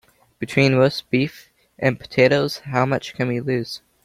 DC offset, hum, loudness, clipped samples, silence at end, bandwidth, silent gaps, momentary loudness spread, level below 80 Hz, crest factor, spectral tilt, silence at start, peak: under 0.1%; none; -20 LUFS; under 0.1%; 0.25 s; 15.5 kHz; none; 9 LU; -56 dBFS; 18 dB; -6.5 dB/octave; 0.4 s; -2 dBFS